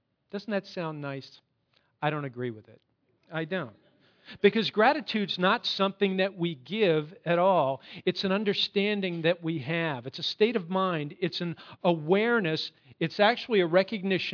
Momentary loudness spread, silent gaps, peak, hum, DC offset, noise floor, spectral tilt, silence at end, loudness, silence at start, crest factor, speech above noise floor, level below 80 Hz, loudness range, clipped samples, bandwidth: 12 LU; none; -8 dBFS; none; under 0.1%; -71 dBFS; -6.5 dB/octave; 0 s; -28 LUFS; 0.35 s; 20 dB; 43 dB; -78 dBFS; 10 LU; under 0.1%; 5.4 kHz